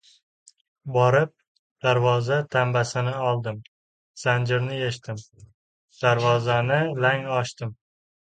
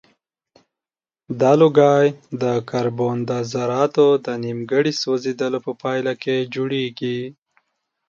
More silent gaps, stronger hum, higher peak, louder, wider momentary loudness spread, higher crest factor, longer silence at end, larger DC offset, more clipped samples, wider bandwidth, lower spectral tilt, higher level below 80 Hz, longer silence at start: first, 1.48-1.76 s, 3.68-4.14 s, 5.54-5.88 s vs none; neither; second, -6 dBFS vs -2 dBFS; second, -23 LUFS vs -19 LUFS; about the same, 14 LU vs 12 LU; about the same, 20 dB vs 18 dB; second, 0.55 s vs 0.75 s; neither; neither; first, 9.2 kHz vs 7.4 kHz; about the same, -6 dB/octave vs -6 dB/octave; about the same, -62 dBFS vs -66 dBFS; second, 0.85 s vs 1.3 s